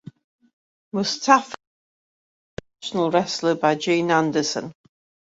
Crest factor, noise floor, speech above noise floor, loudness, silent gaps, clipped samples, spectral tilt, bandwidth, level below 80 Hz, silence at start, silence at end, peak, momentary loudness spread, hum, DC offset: 22 dB; under -90 dBFS; over 69 dB; -21 LUFS; 1.67-2.57 s; under 0.1%; -4 dB/octave; 8 kHz; -62 dBFS; 0.95 s; 0.5 s; -2 dBFS; 21 LU; none; under 0.1%